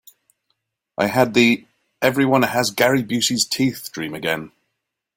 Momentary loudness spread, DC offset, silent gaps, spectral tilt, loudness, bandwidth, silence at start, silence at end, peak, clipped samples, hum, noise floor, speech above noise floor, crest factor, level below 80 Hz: 10 LU; under 0.1%; none; -4 dB/octave; -19 LUFS; 17 kHz; 1 s; 0.7 s; -2 dBFS; under 0.1%; none; -78 dBFS; 59 dB; 18 dB; -58 dBFS